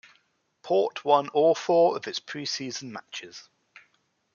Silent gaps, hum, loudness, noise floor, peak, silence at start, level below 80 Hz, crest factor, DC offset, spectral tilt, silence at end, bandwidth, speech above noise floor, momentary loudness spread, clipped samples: none; none; -25 LUFS; -70 dBFS; -6 dBFS; 0.65 s; -82 dBFS; 20 dB; under 0.1%; -4 dB/octave; 0.95 s; 7.2 kHz; 45 dB; 17 LU; under 0.1%